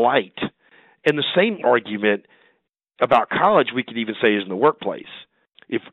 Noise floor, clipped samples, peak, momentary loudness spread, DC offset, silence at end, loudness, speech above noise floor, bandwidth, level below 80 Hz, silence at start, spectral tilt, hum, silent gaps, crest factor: -68 dBFS; under 0.1%; -2 dBFS; 13 LU; under 0.1%; 0.15 s; -20 LUFS; 48 dB; 7.4 kHz; -64 dBFS; 0 s; -7 dB/octave; none; none; 18 dB